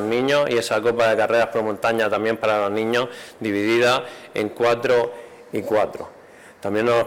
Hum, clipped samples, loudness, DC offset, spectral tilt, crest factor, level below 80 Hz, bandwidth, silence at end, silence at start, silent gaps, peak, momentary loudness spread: none; under 0.1%; -21 LUFS; under 0.1%; -4.5 dB/octave; 12 dB; -62 dBFS; 17 kHz; 0 s; 0 s; none; -8 dBFS; 12 LU